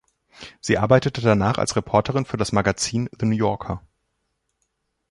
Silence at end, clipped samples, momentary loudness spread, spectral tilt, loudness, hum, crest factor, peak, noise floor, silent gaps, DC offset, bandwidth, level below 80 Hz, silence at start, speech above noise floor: 1.3 s; under 0.1%; 15 LU; -5.5 dB/octave; -21 LUFS; none; 20 dB; -2 dBFS; -74 dBFS; none; under 0.1%; 11.5 kHz; -46 dBFS; 0.4 s; 54 dB